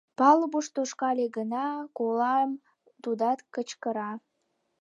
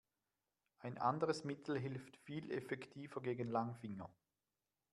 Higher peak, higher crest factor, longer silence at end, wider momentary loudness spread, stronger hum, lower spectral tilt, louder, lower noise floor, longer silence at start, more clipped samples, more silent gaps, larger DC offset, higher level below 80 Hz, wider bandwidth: first, -8 dBFS vs -24 dBFS; about the same, 20 dB vs 22 dB; second, 0.65 s vs 0.8 s; about the same, 14 LU vs 12 LU; neither; second, -4 dB/octave vs -6.5 dB/octave; first, -28 LUFS vs -44 LUFS; second, -77 dBFS vs under -90 dBFS; second, 0.2 s vs 0.8 s; neither; neither; neither; about the same, -86 dBFS vs -82 dBFS; second, 10.5 kHz vs 12 kHz